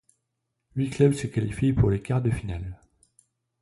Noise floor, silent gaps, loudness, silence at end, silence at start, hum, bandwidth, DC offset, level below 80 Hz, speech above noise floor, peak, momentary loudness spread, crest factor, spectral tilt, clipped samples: -80 dBFS; none; -26 LUFS; 0.85 s; 0.75 s; none; 11.5 kHz; under 0.1%; -42 dBFS; 56 dB; -8 dBFS; 14 LU; 18 dB; -8 dB/octave; under 0.1%